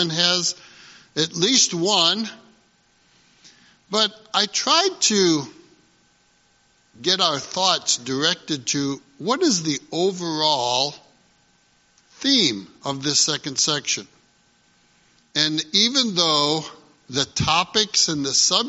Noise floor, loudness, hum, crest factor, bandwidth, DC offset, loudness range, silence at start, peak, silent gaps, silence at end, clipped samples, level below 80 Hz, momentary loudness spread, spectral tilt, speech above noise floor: -61 dBFS; -20 LUFS; none; 22 dB; 8 kHz; under 0.1%; 3 LU; 0 s; 0 dBFS; none; 0 s; under 0.1%; -58 dBFS; 9 LU; -2 dB/octave; 39 dB